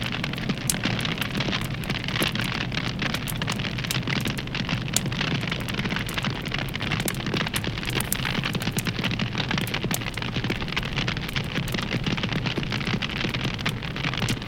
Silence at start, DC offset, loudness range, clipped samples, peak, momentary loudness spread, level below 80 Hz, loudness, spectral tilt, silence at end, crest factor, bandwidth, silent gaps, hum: 0 s; under 0.1%; 1 LU; under 0.1%; 0 dBFS; 3 LU; -40 dBFS; -26 LUFS; -4 dB/octave; 0 s; 26 dB; 17 kHz; none; none